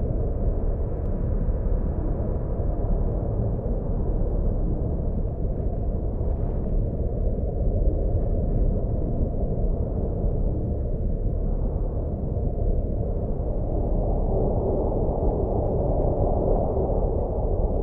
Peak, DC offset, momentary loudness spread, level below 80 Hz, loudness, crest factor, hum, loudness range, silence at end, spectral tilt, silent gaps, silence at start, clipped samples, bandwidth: -10 dBFS; under 0.1%; 4 LU; -26 dBFS; -27 LUFS; 14 dB; none; 3 LU; 0 s; -14 dB/octave; none; 0 s; under 0.1%; 1.8 kHz